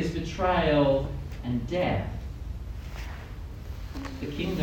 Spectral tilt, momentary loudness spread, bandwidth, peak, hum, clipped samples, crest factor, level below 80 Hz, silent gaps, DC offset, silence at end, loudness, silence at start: -7 dB/octave; 17 LU; 17.5 kHz; -12 dBFS; none; under 0.1%; 18 dB; -38 dBFS; none; under 0.1%; 0 s; -29 LUFS; 0 s